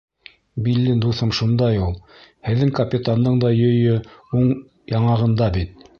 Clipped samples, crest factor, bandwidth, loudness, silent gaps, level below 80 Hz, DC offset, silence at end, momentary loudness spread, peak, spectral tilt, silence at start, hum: under 0.1%; 14 dB; 6.8 kHz; -19 LUFS; none; -38 dBFS; under 0.1%; 0.3 s; 9 LU; -6 dBFS; -8 dB/octave; 0.55 s; none